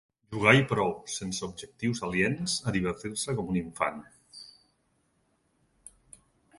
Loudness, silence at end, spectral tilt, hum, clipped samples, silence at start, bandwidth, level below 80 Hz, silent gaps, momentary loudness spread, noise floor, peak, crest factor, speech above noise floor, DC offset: -28 LUFS; 2.1 s; -4.5 dB/octave; none; under 0.1%; 0.3 s; 11.5 kHz; -56 dBFS; none; 23 LU; -72 dBFS; -4 dBFS; 26 dB; 43 dB; under 0.1%